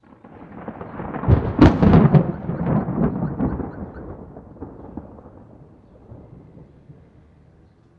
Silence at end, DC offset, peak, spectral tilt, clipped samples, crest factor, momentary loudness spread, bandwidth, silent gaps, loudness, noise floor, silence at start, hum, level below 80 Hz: 1.05 s; under 0.1%; 0 dBFS; -10 dB/octave; under 0.1%; 22 dB; 25 LU; 7 kHz; none; -18 LUFS; -52 dBFS; 0.25 s; none; -34 dBFS